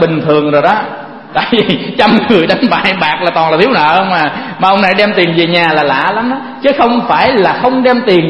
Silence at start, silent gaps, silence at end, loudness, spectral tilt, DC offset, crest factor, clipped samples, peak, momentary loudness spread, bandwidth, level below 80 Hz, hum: 0 s; none; 0 s; -10 LUFS; -7 dB/octave; under 0.1%; 10 dB; 0.2%; 0 dBFS; 6 LU; 11 kHz; -46 dBFS; none